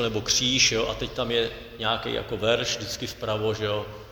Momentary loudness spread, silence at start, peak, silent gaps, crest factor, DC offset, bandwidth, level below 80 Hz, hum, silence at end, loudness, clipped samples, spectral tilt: 11 LU; 0 s; -8 dBFS; none; 20 dB; under 0.1%; 19.5 kHz; -46 dBFS; none; 0 s; -25 LUFS; under 0.1%; -2.5 dB/octave